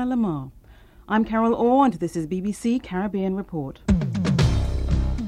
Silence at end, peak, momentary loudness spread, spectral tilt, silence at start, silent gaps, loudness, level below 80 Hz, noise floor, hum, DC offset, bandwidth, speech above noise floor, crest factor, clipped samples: 0 s; -8 dBFS; 9 LU; -7.5 dB/octave; 0 s; none; -23 LUFS; -32 dBFS; -49 dBFS; none; under 0.1%; 12.5 kHz; 26 dB; 16 dB; under 0.1%